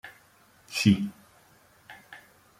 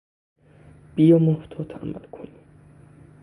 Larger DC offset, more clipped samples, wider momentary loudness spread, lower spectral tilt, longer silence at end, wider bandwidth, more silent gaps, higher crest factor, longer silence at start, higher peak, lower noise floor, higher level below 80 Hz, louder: neither; neither; about the same, 26 LU vs 26 LU; second, -5 dB/octave vs -10.5 dB/octave; second, 0.45 s vs 0.95 s; first, 15.5 kHz vs 10 kHz; neither; about the same, 24 dB vs 20 dB; second, 0.05 s vs 0.95 s; second, -8 dBFS vs -4 dBFS; first, -60 dBFS vs -50 dBFS; about the same, -62 dBFS vs -58 dBFS; second, -26 LUFS vs -20 LUFS